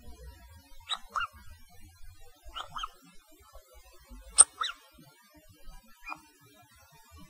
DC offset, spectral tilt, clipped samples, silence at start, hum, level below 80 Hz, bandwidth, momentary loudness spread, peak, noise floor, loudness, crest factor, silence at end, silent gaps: under 0.1%; 1 dB/octave; under 0.1%; 0.05 s; none; -54 dBFS; 16 kHz; 31 LU; -2 dBFS; -59 dBFS; -27 LUFS; 34 dB; 0.05 s; none